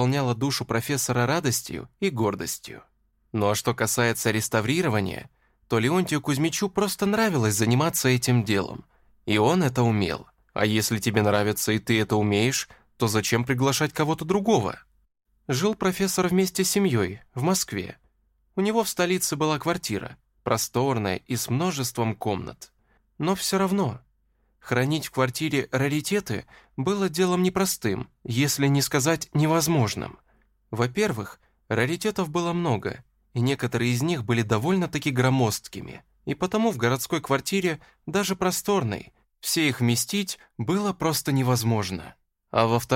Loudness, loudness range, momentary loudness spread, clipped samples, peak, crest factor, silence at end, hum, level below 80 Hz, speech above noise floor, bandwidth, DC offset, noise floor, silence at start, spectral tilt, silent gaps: -25 LUFS; 3 LU; 11 LU; under 0.1%; -6 dBFS; 18 dB; 0 s; none; -56 dBFS; 43 dB; 16.5 kHz; under 0.1%; -67 dBFS; 0 s; -4.5 dB/octave; none